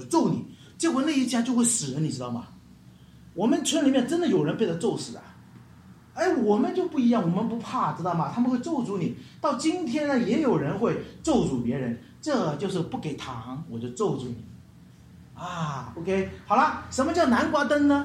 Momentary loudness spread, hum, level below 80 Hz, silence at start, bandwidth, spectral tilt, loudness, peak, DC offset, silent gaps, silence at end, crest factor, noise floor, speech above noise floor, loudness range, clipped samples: 12 LU; none; -58 dBFS; 0 s; 14 kHz; -5 dB/octave; -26 LUFS; -8 dBFS; under 0.1%; none; 0 s; 18 dB; -51 dBFS; 25 dB; 6 LU; under 0.1%